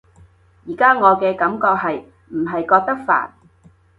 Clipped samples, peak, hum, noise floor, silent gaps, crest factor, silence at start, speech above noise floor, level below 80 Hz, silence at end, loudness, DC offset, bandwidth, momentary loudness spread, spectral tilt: under 0.1%; 0 dBFS; none; -52 dBFS; none; 18 dB; 0.65 s; 35 dB; -58 dBFS; 0.7 s; -17 LUFS; under 0.1%; 5 kHz; 16 LU; -7.5 dB/octave